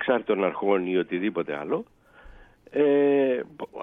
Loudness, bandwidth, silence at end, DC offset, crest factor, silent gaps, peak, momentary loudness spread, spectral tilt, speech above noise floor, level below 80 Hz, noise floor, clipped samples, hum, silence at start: -25 LUFS; 3.9 kHz; 0 s; under 0.1%; 16 dB; none; -10 dBFS; 10 LU; -8.5 dB/octave; 25 dB; -60 dBFS; -49 dBFS; under 0.1%; none; 0 s